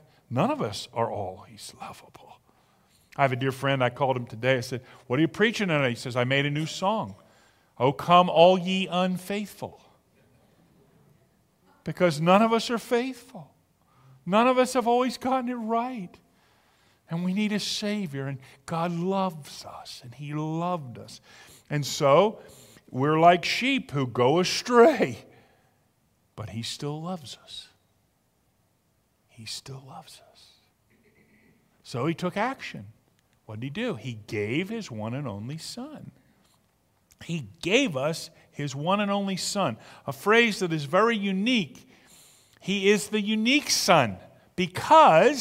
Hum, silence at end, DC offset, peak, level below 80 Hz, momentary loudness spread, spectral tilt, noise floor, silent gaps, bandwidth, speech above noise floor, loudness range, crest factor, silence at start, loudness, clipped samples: none; 0 s; under 0.1%; -2 dBFS; -66 dBFS; 21 LU; -5 dB/octave; -69 dBFS; none; 16 kHz; 44 dB; 13 LU; 24 dB; 0.3 s; -25 LUFS; under 0.1%